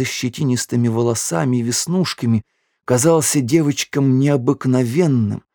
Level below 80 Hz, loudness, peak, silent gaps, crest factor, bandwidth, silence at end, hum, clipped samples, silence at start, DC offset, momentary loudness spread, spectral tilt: -60 dBFS; -17 LUFS; -2 dBFS; none; 16 dB; over 20 kHz; 0.15 s; none; under 0.1%; 0 s; under 0.1%; 5 LU; -5.5 dB/octave